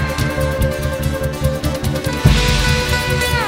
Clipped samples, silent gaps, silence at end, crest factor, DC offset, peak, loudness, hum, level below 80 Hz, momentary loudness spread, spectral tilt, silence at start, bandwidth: under 0.1%; none; 0 s; 16 dB; under 0.1%; 0 dBFS; -17 LUFS; none; -22 dBFS; 6 LU; -5 dB/octave; 0 s; 16.5 kHz